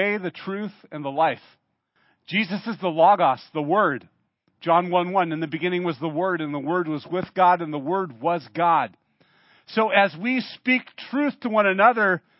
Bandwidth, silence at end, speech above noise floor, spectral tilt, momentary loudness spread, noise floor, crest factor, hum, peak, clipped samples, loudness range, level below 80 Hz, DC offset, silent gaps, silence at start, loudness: 5.8 kHz; 0.2 s; 45 dB; -10 dB/octave; 12 LU; -67 dBFS; 22 dB; none; -2 dBFS; under 0.1%; 2 LU; -74 dBFS; under 0.1%; none; 0 s; -23 LUFS